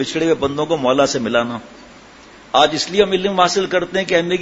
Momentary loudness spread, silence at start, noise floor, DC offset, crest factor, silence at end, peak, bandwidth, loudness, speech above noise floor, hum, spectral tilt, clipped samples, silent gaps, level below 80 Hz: 4 LU; 0 s; -42 dBFS; under 0.1%; 18 dB; 0 s; 0 dBFS; 8 kHz; -17 LUFS; 25 dB; none; -4 dB/octave; under 0.1%; none; -50 dBFS